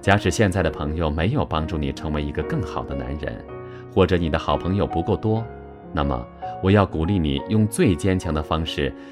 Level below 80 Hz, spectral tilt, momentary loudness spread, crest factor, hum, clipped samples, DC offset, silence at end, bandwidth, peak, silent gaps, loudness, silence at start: -34 dBFS; -6.5 dB/octave; 11 LU; 20 dB; none; under 0.1%; under 0.1%; 0 s; 14 kHz; -2 dBFS; none; -23 LUFS; 0 s